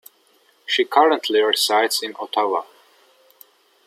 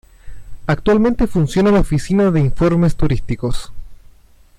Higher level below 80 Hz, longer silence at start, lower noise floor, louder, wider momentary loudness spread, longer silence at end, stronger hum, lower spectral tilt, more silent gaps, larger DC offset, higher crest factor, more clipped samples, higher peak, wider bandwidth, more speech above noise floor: second, -82 dBFS vs -28 dBFS; first, 0.7 s vs 0.25 s; first, -59 dBFS vs -46 dBFS; second, -19 LUFS vs -16 LUFS; about the same, 9 LU vs 9 LU; first, 1.25 s vs 0.65 s; neither; second, -0.5 dB/octave vs -7.5 dB/octave; neither; neither; first, 20 dB vs 10 dB; neither; first, -2 dBFS vs -6 dBFS; first, 15.5 kHz vs 13 kHz; first, 40 dB vs 31 dB